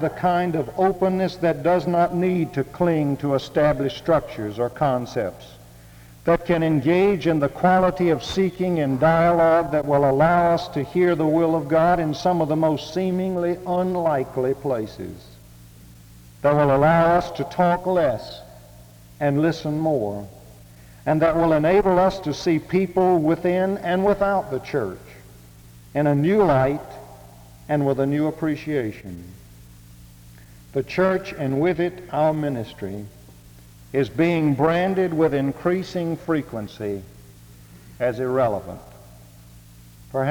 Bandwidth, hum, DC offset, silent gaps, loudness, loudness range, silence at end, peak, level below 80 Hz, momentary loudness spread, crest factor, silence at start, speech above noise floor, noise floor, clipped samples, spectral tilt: over 20 kHz; none; under 0.1%; none; -21 LUFS; 7 LU; 0 s; -6 dBFS; -48 dBFS; 13 LU; 16 dB; 0 s; 25 dB; -46 dBFS; under 0.1%; -7.5 dB/octave